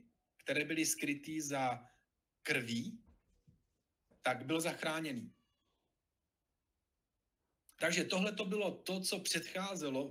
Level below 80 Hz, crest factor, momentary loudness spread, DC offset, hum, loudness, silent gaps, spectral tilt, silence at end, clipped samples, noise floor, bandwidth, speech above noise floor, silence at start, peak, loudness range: -80 dBFS; 22 dB; 12 LU; under 0.1%; none; -38 LUFS; none; -3 dB/octave; 0 s; under 0.1%; -89 dBFS; 16 kHz; 51 dB; 0.45 s; -18 dBFS; 5 LU